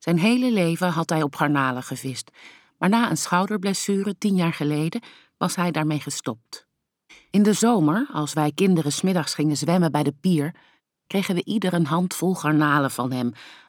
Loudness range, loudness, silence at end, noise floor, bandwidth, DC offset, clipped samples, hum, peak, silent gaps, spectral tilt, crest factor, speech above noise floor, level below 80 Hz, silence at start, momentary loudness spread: 3 LU; -22 LUFS; 0.15 s; -56 dBFS; 18 kHz; under 0.1%; under 0.1%; none; -4 dBFS; none; -5.5 dB/octave; 18 dB; 34 dB; -72 dBFS; 0 s; 11 LU